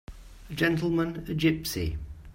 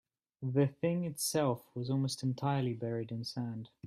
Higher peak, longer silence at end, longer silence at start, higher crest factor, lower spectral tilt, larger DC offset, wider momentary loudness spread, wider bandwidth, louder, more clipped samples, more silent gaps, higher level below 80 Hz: first, -10 dBFS vs -18 dBFS; about the same, 0 s vs 0 s; second, 0.1 s vs 0.4 s; about the same, 20 dB vs 16 dB; about the same, -5.5 dB/octave vs -6 dB/octave; neither; about the same, 10 LU vs 8 LU; about the same, 16.5 kHz vs 15 kHz; first, -28 LUFS vs -35 LUFS; neither; neither; first, -44 dBFS vs -72 dBFS